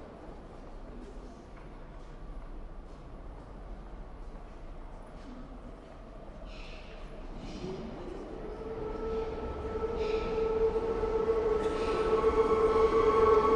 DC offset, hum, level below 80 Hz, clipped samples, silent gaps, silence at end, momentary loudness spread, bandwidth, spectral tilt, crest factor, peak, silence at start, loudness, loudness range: under 0.1%; none; -44 dBFS; under 0.1%; none; 0 s; 23 LU; 9.2 kHz; -6.5 dB/octave; 20 dB; -14 dBFS; 0 s; -30 LUFS; 20 LU